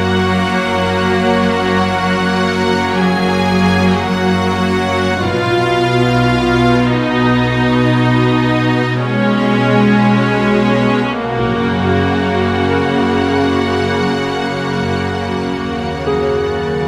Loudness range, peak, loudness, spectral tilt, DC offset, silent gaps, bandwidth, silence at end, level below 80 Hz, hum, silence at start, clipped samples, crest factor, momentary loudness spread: 3 LU; 0 dBFS; -14 LUFS; -6.5 dB/octave; under 0.1%; none; 13 kHz; 0 s; -36 dBFS; none; 0 s; under 0.1%; 14 dB; 5 LU